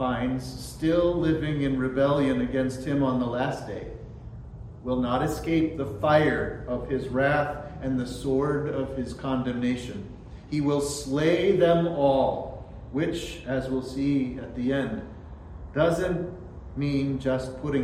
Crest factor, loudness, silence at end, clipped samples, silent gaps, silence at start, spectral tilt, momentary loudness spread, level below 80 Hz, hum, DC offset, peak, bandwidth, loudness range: 18 dB; -26 LUFS; 0 s; under 0.1%; none; 0 s; -6.5 dB/octave; 16 LU; -44 dBFS; none; under 0.1%; -10 dBFS; 15 kHz; 4 LU